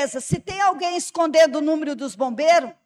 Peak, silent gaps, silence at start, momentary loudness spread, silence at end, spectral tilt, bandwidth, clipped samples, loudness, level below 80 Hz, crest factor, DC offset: -8 dBFS; none; 0 s; 9 LU; 0.15 s; -4 dB/octave; 13 kHz; under 0.1%; -20 LUFS; -54 dBFS; 14 dB; under 0.1%